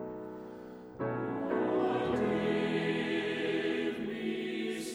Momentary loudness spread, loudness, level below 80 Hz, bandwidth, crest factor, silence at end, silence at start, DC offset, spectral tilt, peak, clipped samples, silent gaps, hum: 13 LU; -33 LUFS; -66 dBFS; over 20 kHz; 16 dB; 0 s; 0 s; under 0.1%; -6 dB/octave; -18 dBFS; under 0.1%; none; none